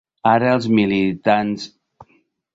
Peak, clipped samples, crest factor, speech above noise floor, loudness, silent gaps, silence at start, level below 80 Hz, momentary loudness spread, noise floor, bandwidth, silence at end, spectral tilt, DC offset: -2 dBFS; under 0.1%; 18 dB; 44 dB; -17 LUFS; none; 0.25 s; -56 dBFS; 11 LU; -61 dBFS; 7.8 kHz; 0.5 s; -7 dB/octave; under 0.1%